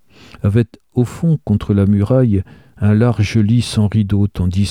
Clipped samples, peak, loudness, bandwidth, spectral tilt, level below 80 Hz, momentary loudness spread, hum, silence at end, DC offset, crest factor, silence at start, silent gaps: under 0.1%; -2 dBFS; -16 LUFS; 11.5 kHz; -7.5 dB/octave; -38 dBFS; 6 LU; none; 0 s; 0.2%; 12 dB; 0.45 s; none